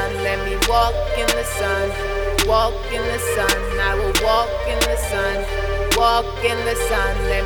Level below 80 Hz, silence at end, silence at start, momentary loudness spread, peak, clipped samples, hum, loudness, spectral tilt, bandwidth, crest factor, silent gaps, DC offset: -26 dBFS; 0 s; 0 s; 5 LU; -2 dBFS; under 0.1%; none; -19 LUFS; -3 dB/octave; 19.5 kHz; 16 dB; none; under 0.1%